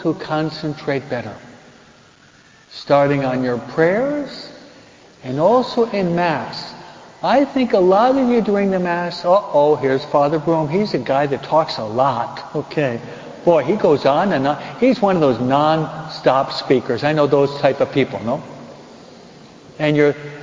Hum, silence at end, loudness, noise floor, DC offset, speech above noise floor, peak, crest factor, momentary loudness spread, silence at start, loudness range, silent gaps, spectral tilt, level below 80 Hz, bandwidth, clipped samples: none; 0 s; -17 LUFS; -48 dBFS; under 0.1%; 31 dB; 0 dBFS; 18 dB; 12 LU; 0 s; 4 LU; none; -7 dB/octave; -54 dBFS; 7.6 kHz; under 0.1%